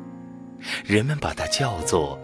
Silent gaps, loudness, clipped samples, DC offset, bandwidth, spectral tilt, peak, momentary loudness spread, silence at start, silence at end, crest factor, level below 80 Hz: none; -24 LUFS; under 0.1%; under 0.1%; 11 kHz; -4.5 dB/octave; -6 dBFS; 18 LU; 0 s; 0 s; 20 dB; -44 dBFS